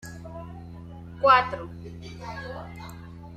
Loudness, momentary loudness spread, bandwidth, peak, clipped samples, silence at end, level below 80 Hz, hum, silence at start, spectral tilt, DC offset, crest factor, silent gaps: -23 LUFS; 23 LU; 14 kHz; -6 dBFS; under 0.1%; 0 s; -52 dBFS; none; 0 s; -5.5 dB/octave; under 0.1%; 24 dB; none